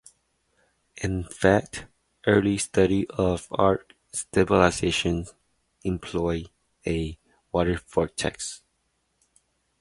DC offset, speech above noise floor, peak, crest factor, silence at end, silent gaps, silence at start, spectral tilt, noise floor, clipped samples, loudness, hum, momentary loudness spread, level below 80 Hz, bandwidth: under 0.1%; 49 dB; -2 dBFS; 24 dB; 1.25 s; none; 0.95 s; -5 dB/octave; -73 dBFS; under 0.1%; -25 LUFS; none; 13 LU; -44 dBFS; 11.5 kHz